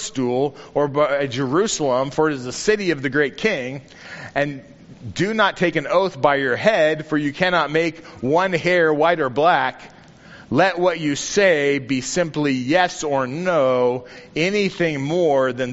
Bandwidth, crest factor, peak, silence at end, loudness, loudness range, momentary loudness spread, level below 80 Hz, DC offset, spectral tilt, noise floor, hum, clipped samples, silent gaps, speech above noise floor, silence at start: 8 kHz; 18 dB; -2 dBFS; 0 s; -19 LUFS; 3 LU; 8 LU; -54 dBFS; under 0.1%; -3.5 dB/octave; -44 dBFS; none; under 0.1%; none; 24 dB; 0 s